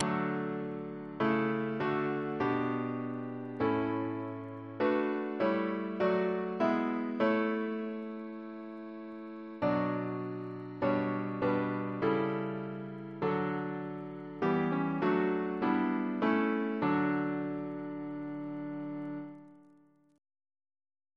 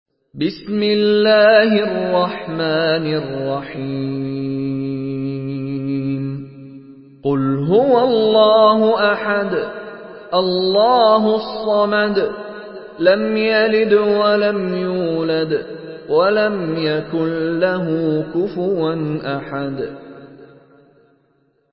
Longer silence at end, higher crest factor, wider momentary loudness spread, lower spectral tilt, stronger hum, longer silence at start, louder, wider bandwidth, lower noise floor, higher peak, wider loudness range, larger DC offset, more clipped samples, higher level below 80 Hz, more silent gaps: first, 1.55 s vs 1.25 s; first, 22 dB vs 16 dB; about the same, 12 LU vs 12 LU; second, -8.5 dB/octave vs -11 dB/octave; neither; second, 0 s vs 0.35 s; second, -33 LUFS vs -17 LUFS; about the same, 6 kHz vs 5.8 kHz; about the same, -64 dBFS vs -61 dBFS; second, -10 dBFS vs 0 dBFS; second, 5 LU vs 8 LU; neither; neither; second, -72 dBFS vs -58 dBFS; neither